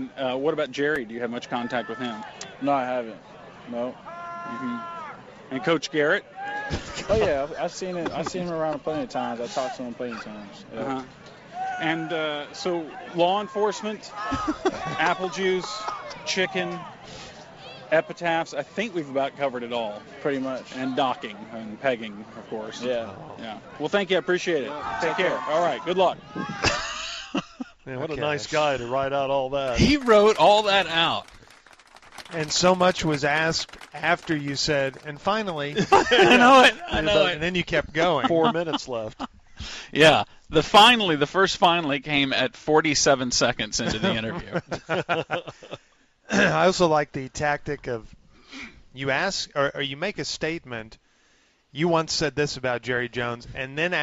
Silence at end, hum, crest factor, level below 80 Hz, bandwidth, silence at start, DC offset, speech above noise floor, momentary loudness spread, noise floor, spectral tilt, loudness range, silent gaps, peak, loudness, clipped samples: 0 s; none; 20 dB; -48 dBFS; 13 kHz; 0 s; under 0.1%; 38 dB; 17 LU; -62 dBFS; -4 dB/octave; 11 LU; none; -4 dBFS; -24 LUFS; under 0.1%